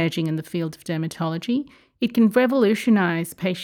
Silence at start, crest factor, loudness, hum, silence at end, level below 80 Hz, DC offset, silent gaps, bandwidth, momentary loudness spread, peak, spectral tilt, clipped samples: 0 s; 14 dB; -22 LUFS; none; 0 s; -66 dBFS; under 0.1%; none; 18 kHz; 10 LU; -8 dBFS; -6.5 dB/octave; under 0.1%